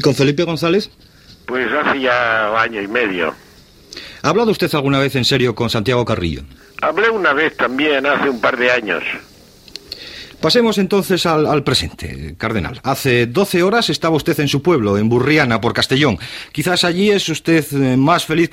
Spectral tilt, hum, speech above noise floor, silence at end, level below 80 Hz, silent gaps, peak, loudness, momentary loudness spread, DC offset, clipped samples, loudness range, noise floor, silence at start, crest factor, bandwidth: -5 dB/octave; none; 27 dB; 0.05 s; -42 dBFS; none; 0 dBFS; -16 LUFS; 12 LU; under 0.1%; under 0.1%; 2 LU; -42 dBFS; 0 s; 16 dB; 16.5 kHz